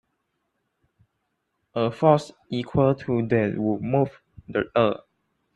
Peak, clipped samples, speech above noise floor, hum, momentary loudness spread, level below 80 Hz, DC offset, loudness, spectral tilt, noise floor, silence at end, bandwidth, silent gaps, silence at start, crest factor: -4 dBFS; under 0.1%; 54 dB; none; 11 LU; -56 dBFS; under 0.1%; -24 LUFS; -8 dB/octave; -76 dBFS; 0.6 s; 10.5 kHz; none; 1.75 s; 22 dB